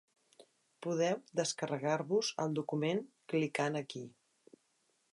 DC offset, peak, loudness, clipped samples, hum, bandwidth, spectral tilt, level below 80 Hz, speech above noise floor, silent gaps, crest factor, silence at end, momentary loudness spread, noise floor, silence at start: under 0.1%; -20 dBFS; -36 LUFS; under 0.1%; none; 11.5 kHz; -4.5 dB/octave; -86 dBFS; 42 dB; none; 18 dB; 1.05 s; 10 LU; -77 dBFS; 0.4 s